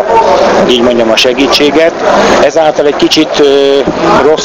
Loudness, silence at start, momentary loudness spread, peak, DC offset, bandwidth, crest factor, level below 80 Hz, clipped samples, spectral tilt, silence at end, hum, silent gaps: -6 LUFS; 0 s; 2 LU; 0 dBFS; under 0.1%; 16.5 kHz; 6 dB; -36 dBFS; 2%; -3.5 dB/octave; 0 s; none; none